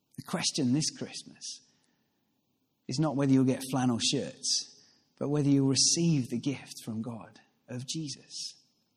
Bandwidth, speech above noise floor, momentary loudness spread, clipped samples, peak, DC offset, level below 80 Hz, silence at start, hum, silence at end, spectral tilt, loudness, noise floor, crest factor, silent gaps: 14.5 kHz; 47 dB; 17 LU; under 0.1%; -14 dBFS; under 0.1%; -70 dBFS; 0.2 s; none; 0.45 s; -4 dB/octave; -29 LUFS; -76 dBFS; 18 dB; none